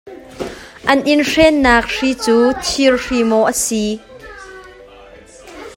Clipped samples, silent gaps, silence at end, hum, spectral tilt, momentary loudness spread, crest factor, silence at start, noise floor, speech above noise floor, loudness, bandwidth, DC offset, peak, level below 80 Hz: under 0.1%; none; 0.05 s; none; -3 dB/octave; 23 LU; 16 dB; 0.05 s; -40 dBFS; 26 dB; -14 LUFS; 16.5 kHz; under 0.1%; 0 dBFS; -38 dBFS